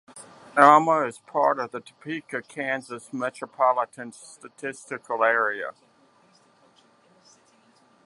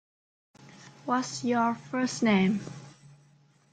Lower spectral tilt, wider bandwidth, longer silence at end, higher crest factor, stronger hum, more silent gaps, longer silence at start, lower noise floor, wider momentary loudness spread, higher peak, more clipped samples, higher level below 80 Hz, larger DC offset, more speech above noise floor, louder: about the same, -4.5 dB/octave vs -5 dB/octave; first, 11.5 kHz vs 9.4 kHz; first, 2.35 s vs 0.8 s; first, 26 dB vs 18 dB; neither; neither; second, 0.15 s vs 0.6 s; about the same, -60 dBFS vs -62 dBFS; first, 22 LU vs 17 LU; first, 0 dBFS vs -12 dBFS; neither; second, -80 dBFS vs -70 dBFS; neither; about the same, 36 dB vs 35 dB; first, -23 LUFS vs -28 LUFS